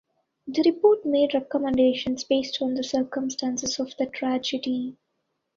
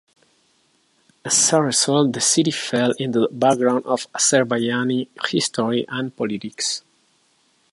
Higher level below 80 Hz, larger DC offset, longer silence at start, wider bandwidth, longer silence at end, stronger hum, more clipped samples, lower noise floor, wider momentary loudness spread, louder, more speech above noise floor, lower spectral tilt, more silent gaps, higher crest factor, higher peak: first, -62 dBFS vs -68 dBFS; neither; second, 0.45 s vs 1.25 s; second, 7.6 kHz vs 11.5 kHz; second, 0.65 s vs 0.95 s; neither; neither; first, -77 dBFS vs -62 dBFS; about the same, 9 LU vs 9 LU; second, -25 LUFS vs -19 LUFS; first, 53 dB vs 43 dB; about the same, -3.5 dB/octave vs -3 dB/octave; neither; about the same, 16 dB vs 20 dB; second, -8 dBFS vs -2 dBFS